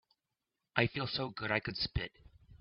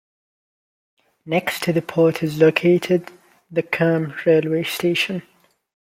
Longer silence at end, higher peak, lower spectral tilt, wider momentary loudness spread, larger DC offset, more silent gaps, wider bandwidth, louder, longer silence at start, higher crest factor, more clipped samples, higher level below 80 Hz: second, 0.05 s vs 0.75 s; second, -10 dBFS vs -2 dBFS; second, -3 dB/octave vs -6 dB/octave; about the same, 6 LU vs 7 LU; neither; neither; second, 5.8 kHz vs 16.5 kHz; second, -36 LUFS vs -19 LUFS; second, 0.75 s vs 1.25 s; first, 30 dB vs 18 dB; neither; first, -54 dBFS vs -64 dBFS